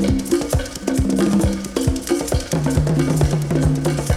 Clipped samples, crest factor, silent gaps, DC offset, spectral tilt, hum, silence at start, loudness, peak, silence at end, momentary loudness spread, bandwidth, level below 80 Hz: under 0.1%; 14 dB; none; under 0.1%; -6 dB/octave; none; 0 s; -19 LUFS; -4 dBFS; 0 s; 4 LU; 15.5 kHz; -28 dBFS